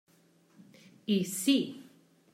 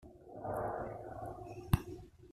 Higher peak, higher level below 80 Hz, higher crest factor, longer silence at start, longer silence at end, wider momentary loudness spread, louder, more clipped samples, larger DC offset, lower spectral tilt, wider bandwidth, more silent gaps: about the same, -16 dBFS vs -16 dBFS; second, -84 dBFS vs -50 dBFS; second, 18 dB vs 26 dB; first, 1.1 s vs 0 s; first, 0.5 s vs 0 s; about the same, 16 LU vs 14 LU; first, -30 LUFS vs -41 LUFS; neither; neither; second, -4 dB/octave vs -7 dB/octave; about the same, 16 kHz vs 15 kHz; neither